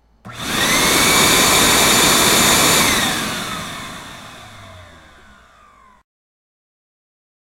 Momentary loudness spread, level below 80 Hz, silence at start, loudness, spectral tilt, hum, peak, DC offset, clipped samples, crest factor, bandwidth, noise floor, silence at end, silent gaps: 18 LU; -40 dBFS; 0.25 s; -12 LUFS; -1.5 dB/octave; none; 0 dBFS; under 0.1%; under 0.1%; 18 dB; 16 kHz; -48 dBFS; 2.6 s; none